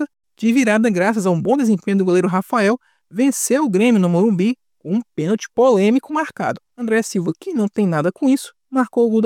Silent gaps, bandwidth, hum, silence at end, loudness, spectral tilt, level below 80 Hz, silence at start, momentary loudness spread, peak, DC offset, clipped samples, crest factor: none; 16 kHz; none; 0 s; -18 LUFS; -6 dB/octave; -66 dBFS; 0 s; 9 LU; -4 dBFS; under 0.1%; under 0.1%; 14 dB